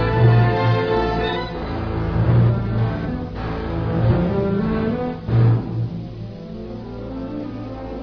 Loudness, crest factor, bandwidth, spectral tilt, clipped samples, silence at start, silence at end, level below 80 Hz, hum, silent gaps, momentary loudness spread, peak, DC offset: -20 LUFS; 16 dB; 5.4 kHz; -9.5 dB/octave; under 0.1%; 0 s; 0 s; -32 dBFS; none; none; 15 LU; -4 dBFS; under 0.1%